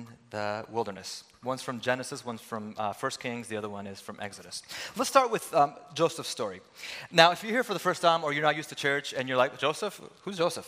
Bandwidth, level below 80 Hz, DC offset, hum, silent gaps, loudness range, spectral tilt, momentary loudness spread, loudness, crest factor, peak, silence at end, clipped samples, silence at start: 16 kHz; -76 dBFS; under 0.1%; none; none; 9 LU; -3.5 dB/octave; 15 LU; -29 LUFS; 30 dB; 0 dBFS; 0 s; under 0.1%; 0 s